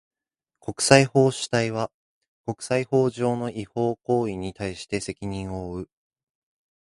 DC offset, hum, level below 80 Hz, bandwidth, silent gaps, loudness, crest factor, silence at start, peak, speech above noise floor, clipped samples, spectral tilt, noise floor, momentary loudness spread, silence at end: under 0.1%; none; -52 dBFS; 11.5 kHz; 1.94-2.21 s, 2.28-2.44 s; -24 LUFS; 26 dB; 0.65 s; 0 dBFS; 63 dB; under 0.1%; -5 dB/octave; -87 dBFS; 17 LU; 1 s